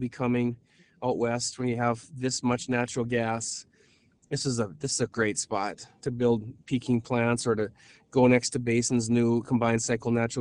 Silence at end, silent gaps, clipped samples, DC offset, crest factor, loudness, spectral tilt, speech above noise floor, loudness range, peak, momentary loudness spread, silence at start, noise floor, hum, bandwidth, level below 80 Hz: 0 s; none; under 0.1%; under 0.1%; 20 dB; -28 LUFS; -5 dB/octave; 36 dB; 5 LU; -6 dBFS; 8 LU; 0 s; -63 dBFS; none; 11 kHz; -58 dBFS